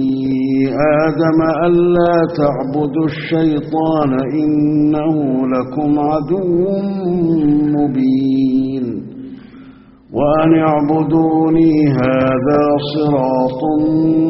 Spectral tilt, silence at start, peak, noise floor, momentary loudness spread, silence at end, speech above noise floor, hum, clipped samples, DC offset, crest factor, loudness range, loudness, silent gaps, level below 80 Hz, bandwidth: -7.5 dB/octave; 0 s; 0 dBFS; -40 dBFS; 6 LU; 0 s; 27 dB; none; under 0.1%; under 0.1%; 14 dB; 3 LU; -14 LUFS; none; -44 dBFS; 5.8 kHz